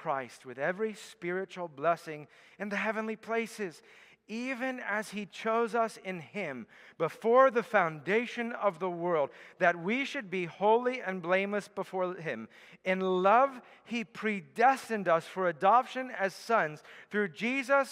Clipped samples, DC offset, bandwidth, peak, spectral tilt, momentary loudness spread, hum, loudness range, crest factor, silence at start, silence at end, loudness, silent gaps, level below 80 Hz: under 0.1%; under 0.1%; 15.5 kHz; -10 dBFS; -5.5 dB/octave; 14 LU; none; 6 LU; 20 dB; 0 s; 0 s; -31 LUFS; none; -84 dBFS